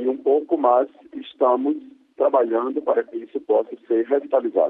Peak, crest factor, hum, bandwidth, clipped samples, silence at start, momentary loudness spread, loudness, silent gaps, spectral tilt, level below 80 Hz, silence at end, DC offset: -6 dBFS; 16 dB; none; 3.9 kHz; under 0.1%; 0 s; 12 LU; -21 LUFS; none; -8 dB/octave; -74 dBFS; 0 s; under 0.1%